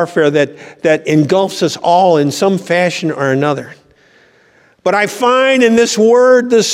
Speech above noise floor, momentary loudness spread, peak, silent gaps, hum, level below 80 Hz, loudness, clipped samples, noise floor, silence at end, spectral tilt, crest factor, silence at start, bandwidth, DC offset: 38 dB; 7 LU; 0 dBFS; none; none; -62 dBFS; -12 LUFS; under 0.1%; -49 dBFS; 0 s; -4.5 dB/octave; 12 dB; 0 s; 15.5 kHz; under 0.1%